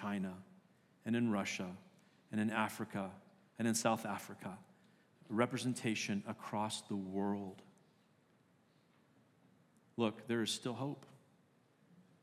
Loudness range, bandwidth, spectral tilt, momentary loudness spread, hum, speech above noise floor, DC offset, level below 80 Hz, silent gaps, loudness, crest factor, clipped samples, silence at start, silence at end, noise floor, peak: 6 LU; 15.5 kHz; -4.5 dB/octave; 15 LU; none; 33 dB; under 0.1%; under -90 dBFS; none; -40 LUFS; 24 dB; under 0.1%; 0 s; 0.25 s; -72 dBFS; -18 dBFS